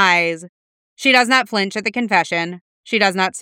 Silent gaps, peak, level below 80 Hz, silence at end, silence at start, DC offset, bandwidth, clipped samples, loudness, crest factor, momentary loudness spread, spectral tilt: 0.49-0.97 s, 2.61-2.84 s; 0 dBFS; -72 dBFS; 0 s; 0 s; under 0.1%; 16.5 kHz; under 0.1%; -16 LUFS; 18 dB; 11 LU; -3 dB/octave